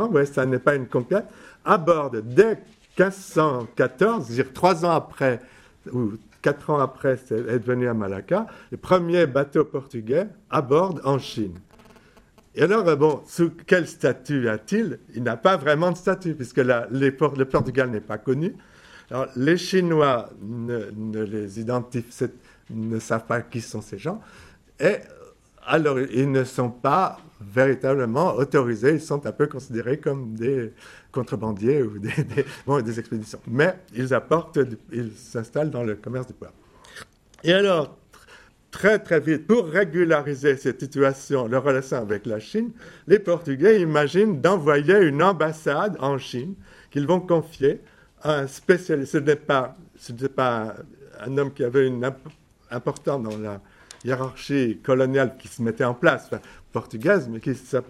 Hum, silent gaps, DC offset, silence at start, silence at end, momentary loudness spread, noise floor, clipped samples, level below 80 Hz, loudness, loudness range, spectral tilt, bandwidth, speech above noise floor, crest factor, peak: none; none; under 0.1%; 0 s; 0.05 s; 13 LU; -54 dBFS; under 0.1%; -58 dBFS; -23 LUFS; 5 LU; -6.5 dB/octave; 13 kHz; 32 dB; 22 dB; -2 dBFS